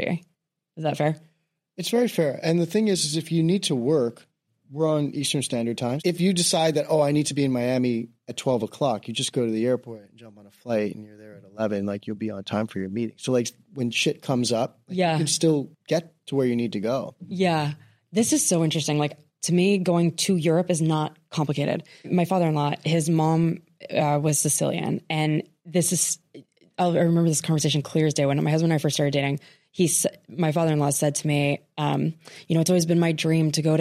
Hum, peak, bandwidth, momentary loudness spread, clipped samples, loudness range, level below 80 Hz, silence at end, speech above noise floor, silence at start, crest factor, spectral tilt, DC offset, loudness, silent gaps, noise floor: none; -10 dBFS; 15 kHz; 9 LU; under 0.1%; 5 LU; -66 dBFS; 0 s; 43 dB; 0 s; 14 dB; -5 dB/octave; under 0.1%; -24 LUFS; none; -67 dBFS